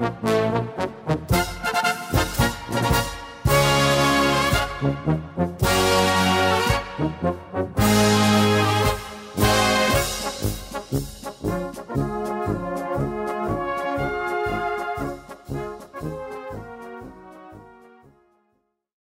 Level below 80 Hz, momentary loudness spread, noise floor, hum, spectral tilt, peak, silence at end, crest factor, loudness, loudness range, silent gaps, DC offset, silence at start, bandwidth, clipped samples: -38 dBFS; 15 LU; -71 dBFS; none; -4.5 dB/octave; -6 dBFS; 1.35 s; 16 dB; -22 LUFS; 11 LU; none; under 0.1%; 0 s; 16.5 kHz; under 0.1%